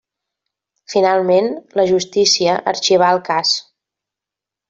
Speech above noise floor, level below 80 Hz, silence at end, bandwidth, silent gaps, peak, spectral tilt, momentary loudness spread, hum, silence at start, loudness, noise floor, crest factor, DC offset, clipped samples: 71 dB; -62 dBFS; 1.1 s; 7.8 kHz; none; -2 dBFS; -3 dB/octave; 6 LU; none; 0.9 s; -15 LUFS; -86 dBFS; 16 dB; under 0.1%; under 0.1%